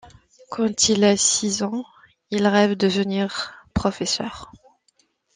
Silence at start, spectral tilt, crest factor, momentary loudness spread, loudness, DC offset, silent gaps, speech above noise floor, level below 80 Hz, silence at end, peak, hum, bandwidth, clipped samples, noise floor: 0.05 s; -3.5 dB/octave; 18 dB; 15 LU; -21 LUFS; under 0.1%; none; 44 dB; -50 dBFS; 0.9 s; -4 dBFS; none; 10 kHz; under 0.1%; -65 dBFS